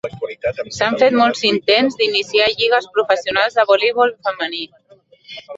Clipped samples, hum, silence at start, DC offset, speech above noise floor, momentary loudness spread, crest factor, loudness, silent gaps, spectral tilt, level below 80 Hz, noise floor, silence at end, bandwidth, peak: under 0.1%; none; 0.05 s; under 0.1%; 31 dB; 10 LU; 16 dB; -16 LUFS; none; -3.5 dB/octave; -56 dBFS; -48 dBFS; 0 s; 8 kHz; 0 dBFS